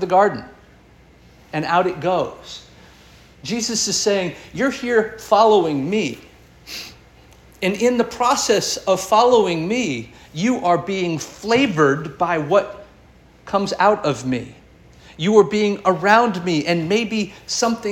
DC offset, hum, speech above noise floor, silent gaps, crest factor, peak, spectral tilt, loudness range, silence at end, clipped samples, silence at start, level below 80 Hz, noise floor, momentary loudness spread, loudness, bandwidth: under 0.1%; none; 30 dB; none; 18 dB; -2 dBFS; -4 dB/octave; 4 LU; 0 s; under 0.1%; 0 s; -52 dBFS; -49 dBFS; 14 LU; -19 LUFS; 17 kHz